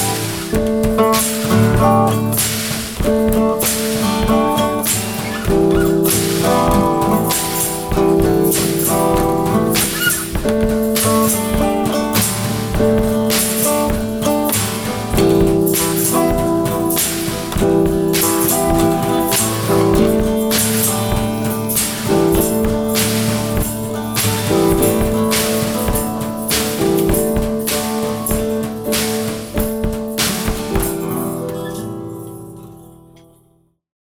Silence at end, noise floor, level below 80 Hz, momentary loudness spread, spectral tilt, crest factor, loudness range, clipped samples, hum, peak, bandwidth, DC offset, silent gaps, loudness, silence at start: 1.05 s; -57 dBFS; -30 dBFS; 7 LU; -4.5 dB/octave; 16 dB; 4 LU; under 0.1%; none; 0 dBFS; over 20 kHz; under 0.1%; none; -16 LUFS; 0 s